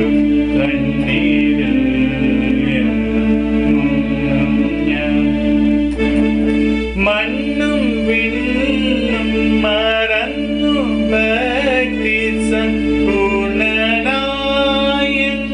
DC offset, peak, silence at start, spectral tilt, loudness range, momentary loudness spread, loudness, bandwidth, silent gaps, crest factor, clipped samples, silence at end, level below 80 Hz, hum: under 0.1%; -4 dBFS; 0 s; -6 dB/octave; 1 LU; 2 LU; -15 LUFS; 10 kHz; none; 10 dB; under 0.1%; 0 s; -30 dBFS; none